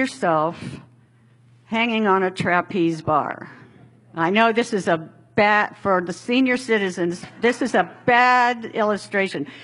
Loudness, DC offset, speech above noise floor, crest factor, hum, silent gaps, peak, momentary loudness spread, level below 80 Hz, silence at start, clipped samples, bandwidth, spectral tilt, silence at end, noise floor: -20 LUFS; under 0.1%; 34 dB; 20 dB; none; none; -2 dBFS; 9 LU; -62 dBFS; 0 s; under 0.1%; 11.5 kHz; -5 dB/octave; 0 s; -54 dBFS